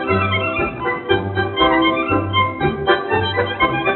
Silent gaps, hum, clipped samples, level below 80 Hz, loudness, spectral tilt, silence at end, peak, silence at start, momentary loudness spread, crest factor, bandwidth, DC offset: none; none; under 0.1%; -40 dBFS; -18 LUFS; -3 dB/octave; 0 s; -2 dBFS; 0 s; 5 LU; 16 dB; 4.2 kHz; under 0.1%